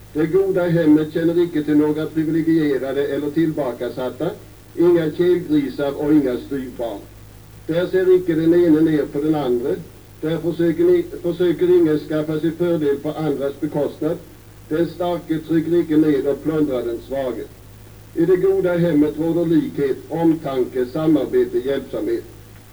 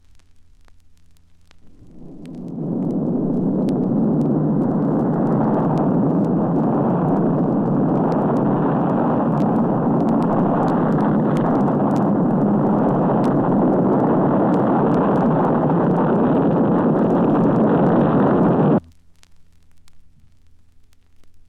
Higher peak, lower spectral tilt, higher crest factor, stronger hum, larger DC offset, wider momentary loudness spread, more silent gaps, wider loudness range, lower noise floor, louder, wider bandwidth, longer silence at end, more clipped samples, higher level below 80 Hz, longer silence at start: about the same, -6 dBFS vs -6 dBFS; second, -8 dB/octave vs -10.5 dB/octave; about the same, 14 dB vs 12 dB; neither; first, 0.2% vs under 0.1%; first, 10 LU vs 4 LU; neither; about the same, 3 LU vs 5 LU; second, -41 dBFS vs -48 dBFS; about the same, -19 LUFS vs -18 LUFS; first, over 20 kHz vs 5.8 kHz; about the same, 0.1 s vs 0.1 s; neither; about the same, -48 dBFS vs -50 dBFS; second, 0 s vs 1.65 s